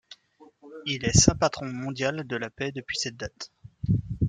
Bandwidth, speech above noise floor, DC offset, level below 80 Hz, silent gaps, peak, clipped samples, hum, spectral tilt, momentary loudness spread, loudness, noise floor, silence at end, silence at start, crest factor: 10.5 kHz; 30 dB; under 0.1%; -44 dBFS; none; -2 dBFS; under 0.1%; none; -4 dB/octave; 18 LU; -26 LUFS; -56 dBFS; 0 s; 0.1 s; 26 dB